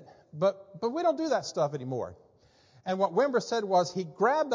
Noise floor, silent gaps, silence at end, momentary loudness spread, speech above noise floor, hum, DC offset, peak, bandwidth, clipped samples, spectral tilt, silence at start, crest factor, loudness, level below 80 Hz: -62 dBFS; none; 0 s; 9 LU; 34 dB; none; under 0.1%; -14 dBFS; 7.6 kHz; under 0.1%; -5 dB/octave; 0 s; 16 dB; -29 LUFS; -70 dBFS